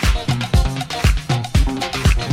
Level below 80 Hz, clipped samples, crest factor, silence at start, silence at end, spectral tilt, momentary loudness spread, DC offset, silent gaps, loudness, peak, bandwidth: -20 dBFS; under 0.1%; 14 dB; 0 s; 0 s; -5 dB/octave; 3 LU; under 0.1%; none; -19 LUFS; -2 dBFS; 16 kHz